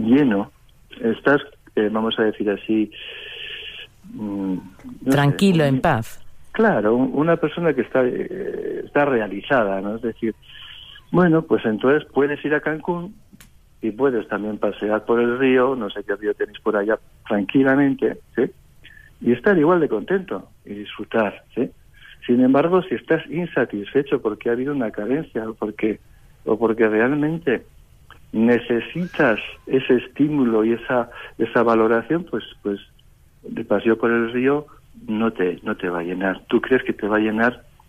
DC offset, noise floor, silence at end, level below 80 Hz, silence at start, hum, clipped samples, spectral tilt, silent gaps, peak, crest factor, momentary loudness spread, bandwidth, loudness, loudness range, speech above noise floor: under 0.1%; -51 dBFS; 0.3 s; -52 dBFS; 0 s; none; under 0.1%; -7.5 dB/octave; none; -6 dBFS; 14 dB; 13 LU; 15 kHz; -21 LUFS; 3 LU; 31 dB